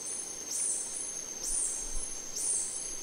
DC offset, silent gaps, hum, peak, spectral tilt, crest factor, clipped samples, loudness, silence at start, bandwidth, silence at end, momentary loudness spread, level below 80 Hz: under 0.1%; none; none; -20 dBFS; 0.5 dB/octave; 16 dB; under 0.1%; -32 LUFS; 0 s; 16 kHz; 0 s; 6 LU; -48 dBFS